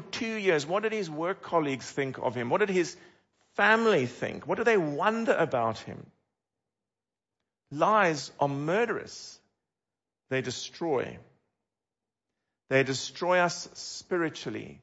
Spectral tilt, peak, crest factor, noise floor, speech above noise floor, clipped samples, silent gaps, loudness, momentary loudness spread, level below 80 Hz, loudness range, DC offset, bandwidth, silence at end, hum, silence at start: -4.5 dB/octave; -10 dBFS; 20 dB; under -90 dBFS; over 62 dB; under 0.1%; none; -28 LUFS; 14 LU; -72 dBFS; 7 LU; under 0.1%; 8 kHz; 0.05 s; none; 0 s